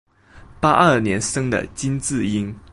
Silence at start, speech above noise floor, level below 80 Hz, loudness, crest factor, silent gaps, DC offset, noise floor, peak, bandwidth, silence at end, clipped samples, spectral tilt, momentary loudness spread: 0.35 s; 26 dB; -44 dBFS; -19 LUFS; 18 dB; none; under 0.1%; -46 dBFS; -2 dBFS; 11.5 kHz; 0.15 s; under 0.1%; -5 dB/octave; 9 LU